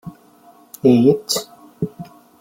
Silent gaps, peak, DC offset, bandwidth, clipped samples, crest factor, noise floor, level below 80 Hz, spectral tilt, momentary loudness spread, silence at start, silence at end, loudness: none; -2 dBFS; under 0.1%; 16.5 kHz; under 0.1%; 18 dB; -49 dBFS; -58 dBFS; -5.5 dB/octave; 26 LU; 0.05 s; 0.35 s; -18 LUFS